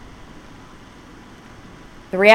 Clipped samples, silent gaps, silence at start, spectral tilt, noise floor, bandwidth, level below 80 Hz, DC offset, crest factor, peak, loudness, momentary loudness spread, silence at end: under 0.1%; none; 2.15 s; -4.5 dB/octave; -42 dBFS; 14 kHz; -48 dBFS; under 0.1%; 20 dB; 0 dBFS; -19 LUFS; 15 LU; 0 s